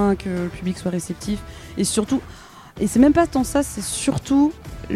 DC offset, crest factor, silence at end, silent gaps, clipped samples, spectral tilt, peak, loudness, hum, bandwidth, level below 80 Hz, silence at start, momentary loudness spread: under 0.1%; 18 dB; 0 s; none; under 0.1%; -5 dB/octave; -2 dBFS; -21 LUFS; none; 15.5 kHz; -40 dBFS; 0 s; 16 LU